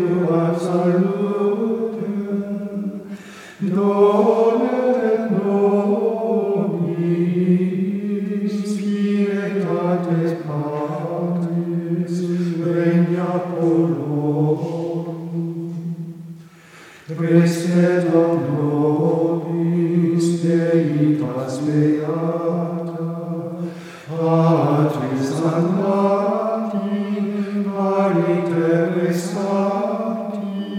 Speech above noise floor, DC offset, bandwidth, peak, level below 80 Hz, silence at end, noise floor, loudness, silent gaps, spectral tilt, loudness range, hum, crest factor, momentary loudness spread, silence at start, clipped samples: 26 dB; under 0.1%; 11 kHz; -2 dBFS; -70 dBFS; 0 s; -44 dBFS; -20 LUFS; none; -8 dB/octave; 4 LU; none; 16 dB; 10 LU; 0 s; under 0.1%